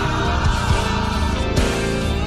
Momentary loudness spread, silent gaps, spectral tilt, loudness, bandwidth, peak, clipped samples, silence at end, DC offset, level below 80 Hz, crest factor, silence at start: 2 LU; none; -5 dB/octave; -20 LUFS; 14.5 kHz; -4 dBFS; under 0.1%; 0 s; under 0.1%; -24 dBFS; 14 dB; 0 s